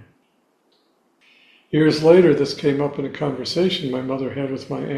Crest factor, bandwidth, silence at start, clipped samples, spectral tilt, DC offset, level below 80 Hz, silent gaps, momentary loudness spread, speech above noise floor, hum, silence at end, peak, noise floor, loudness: 20 dB; 11.5 kHz; 1.7 s; under 0.1%; -6.5 dB/octave; under 0.1%; -58 dBFS; none; 12 LU; 45 dB; none; 0 s; 0 dBFS; -64 dBFS; -19 LUFS